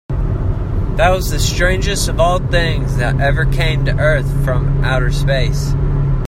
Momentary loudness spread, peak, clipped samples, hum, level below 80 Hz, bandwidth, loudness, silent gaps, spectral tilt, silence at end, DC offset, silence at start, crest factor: 5 LU; 0 dBFS; under 0.1%; none; -18 dBFS; 16 kHz; -16 LUFS; none; -5.5 dB/octave; 0 s; under 0.1%; 0.1 s; 14 dB